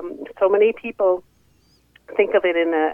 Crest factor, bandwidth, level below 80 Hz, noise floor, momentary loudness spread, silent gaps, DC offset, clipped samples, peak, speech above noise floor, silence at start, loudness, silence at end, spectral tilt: 16 dB; 5 kHz; -62 dBFS; -58 dBFS; 10 LU; none; under 0.1%; under 0.1%; -4 dBFS; 40 dB; 0 s; -20 LUFS; 0 s; -6.5 dB/octave